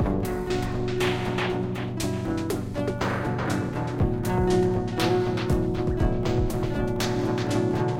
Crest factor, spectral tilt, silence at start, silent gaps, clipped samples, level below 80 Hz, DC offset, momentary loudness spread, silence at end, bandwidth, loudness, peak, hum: 16 dB; -6.5 dB/octave; 0 s; none; under 0.1%; -36 dBFS; under 0.1%; 5 LU; 0 s; 16.5 kHz; -26 LUFS; -8 dBFS; none